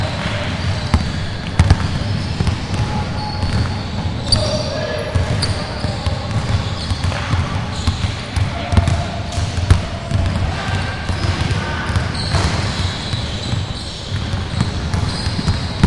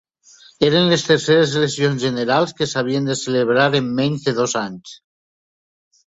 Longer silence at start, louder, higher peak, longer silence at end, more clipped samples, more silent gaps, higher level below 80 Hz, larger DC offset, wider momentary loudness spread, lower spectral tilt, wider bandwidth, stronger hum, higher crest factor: second, 0 s vs 0.6 s; about the same, -20 LUFS vs -18 LUFS; about the same, 0 dBFS vs -2 dBFS; second, 0 s vs 1.2 s; neither; neither; first, -28 dBFS vs -58 dBFS; neither; about the same, 6 LU vs 6 LU; about the same, -5.5 dB/octave vs -4.5 dB/octave; first, 11.5 kHz vs 8 kHz; neither; about the same, 18 dB vs 18 dB